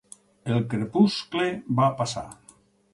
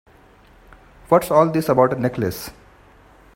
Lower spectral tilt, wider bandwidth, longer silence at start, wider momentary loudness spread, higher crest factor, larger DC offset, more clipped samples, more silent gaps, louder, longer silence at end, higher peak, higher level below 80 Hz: about the same, -6 dB/octave vs -6.5 dB/octave; second, 11.5 kHz vs 16.5 kHz; second, 0.45 s vs 1.1 s; about the same, 13 LU vs 13 LU; about the same, 20 dB vs 20 dB; neither; neither; neither; second, -25 LUFS vs -18 LUFS; second, 0.6 s vs 0.85 s; second, -6 dBFS vs 0 dBFS; second, -60 dBFS vs -50 dBFS